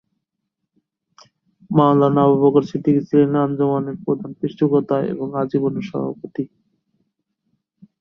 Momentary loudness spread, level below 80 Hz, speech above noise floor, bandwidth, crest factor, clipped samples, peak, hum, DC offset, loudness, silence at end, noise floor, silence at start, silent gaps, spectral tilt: 12 LU; -62 dBFS; 60 dB; 6.4 kHz; 18 dB; under 0.1%; -2 dBFS; none; under 0.1%; -19 LUFS; 1.55 s; -78 dBFS; 1.7 s; none; -10 dB/octave